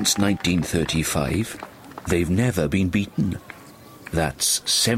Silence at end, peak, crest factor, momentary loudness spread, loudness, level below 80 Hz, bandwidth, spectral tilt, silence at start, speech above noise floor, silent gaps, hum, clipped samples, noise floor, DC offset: 0 s; -6 dBFS; 18 dB; 17 LU; -22 LUFS; -42 dBFS; 16 kHz; -4 dB/octave; 0 s; 23 dB; none; none; under 0.1%; -44 dBFS; under 0.1%